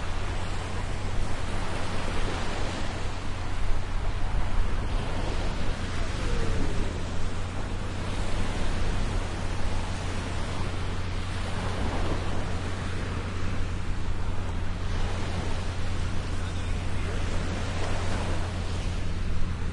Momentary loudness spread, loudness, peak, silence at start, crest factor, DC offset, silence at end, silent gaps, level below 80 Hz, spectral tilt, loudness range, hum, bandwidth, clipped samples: 3 LU; -32 LUFS; -12 dBFS; 0 s; 14 dB; under 0.1%; 0 s; none; -30 dBFS; -5.5 dB/octave; 1 LU; none; 11 kHz; under 0.1%